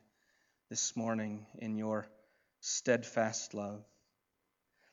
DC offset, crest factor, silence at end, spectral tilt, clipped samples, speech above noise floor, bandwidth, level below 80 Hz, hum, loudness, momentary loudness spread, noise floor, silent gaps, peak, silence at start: under 0.1%; 24 dB; 1.1 s; -3.5 dB/octave; under 0.1%; 47 dB; 8 kHz; -88 dBFS; none; -37 LUFS; 12 LU; -83 dBFS; none; -16 dBFS; 0.7 s